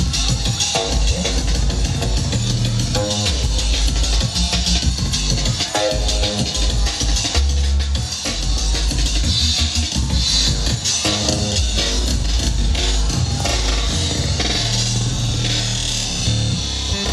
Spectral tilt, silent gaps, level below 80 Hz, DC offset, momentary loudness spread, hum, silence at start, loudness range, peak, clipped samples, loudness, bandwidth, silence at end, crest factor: -3.5 dB/octave; none; -22 dBFS; under 0.1%; 3 LU; none; 0 s; 2 LU; -2 dBFS; under 0.1%; -18 LUFS; 13 kHz; 0 s; 16 dB